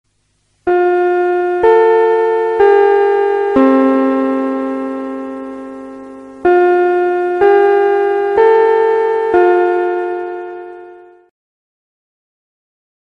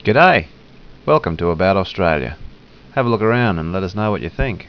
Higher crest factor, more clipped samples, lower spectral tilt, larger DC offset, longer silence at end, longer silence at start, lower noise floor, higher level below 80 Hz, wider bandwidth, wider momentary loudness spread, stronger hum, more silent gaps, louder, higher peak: second, 12 dB vs 18 dB; neither; second, -6.5 dB/octave vs -8 dB/octave; second, under 0.1% vs 0.3%; first, 2.2 s vs 0 s; first, 0.65 s vs 0.05 s; first, -61 dBFS vs -38 dBFS; second, -52 dBFS vs -34 dBFS; about the same, 5.6 kHz vs 5.4 kHz; first, 17 LU vs 13 LU; first, 50 Hz at -60 dBFS vs none; neither; first, -12 LUFS vs -17 LUFS; about the same, 0 dBFS vs 0 dBFS